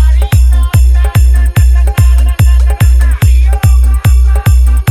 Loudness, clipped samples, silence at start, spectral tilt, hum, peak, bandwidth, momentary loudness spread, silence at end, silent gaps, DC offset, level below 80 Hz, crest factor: -9 LUFS; 0.2%; 0 s; -6 dB/octave; none; 0 dBFS; 14.5 kHz; 0 LU; 0 s; none; under 0.1%; -6 dBFS; 6 dB